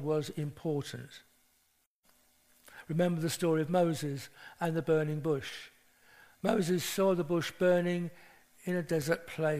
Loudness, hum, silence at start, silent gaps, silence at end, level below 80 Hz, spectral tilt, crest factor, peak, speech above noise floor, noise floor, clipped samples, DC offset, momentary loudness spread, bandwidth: -32 LUFS; none; 0 s; 1.86-2.03 s; 0 s; -68 dBFS; -6 dB/octave; 20 dB; -12 dBFS; 42 dB; -74 dBFS; under 0.1%; under 0.1%; 14 LU; 15.5 kHz